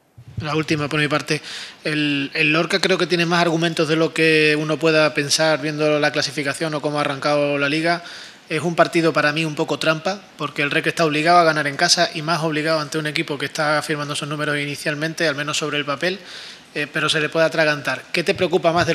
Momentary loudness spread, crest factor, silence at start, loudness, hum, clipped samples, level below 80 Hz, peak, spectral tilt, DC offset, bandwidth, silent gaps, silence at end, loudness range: 9 LU; 20 dB; 0.2 s; -19 LUFS; none; under 0.1%; -60 dBFS; 0 dBFS; -4 dB/octave; under 0.1%; 15 kHz; none; 0 s; 5 LU